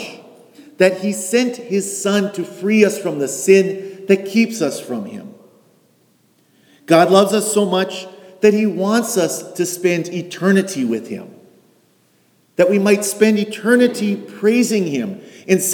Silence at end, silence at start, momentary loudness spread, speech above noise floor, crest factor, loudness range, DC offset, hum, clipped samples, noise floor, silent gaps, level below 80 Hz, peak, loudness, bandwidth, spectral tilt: 0 s; 0 s; 13 LU; 41 dB; 16 dB; 4 LU; under 0.1%; none; under 0.1%; -57 dBFS; none; -70 dBFS; 0 dBFS; -17 LUFS; 19.5 kHz; -4.5 dB/octave